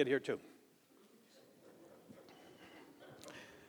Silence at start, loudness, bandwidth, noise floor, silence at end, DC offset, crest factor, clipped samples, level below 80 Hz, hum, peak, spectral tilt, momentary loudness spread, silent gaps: 0 s; -42 LUFS; over 20 kHz; -67 dBFS; 0.1 s; under 0.1%; 26 dB; under 0.1%; -88 dBFS; none; -20 dBFS; -5 dB/octave; 24 LU; none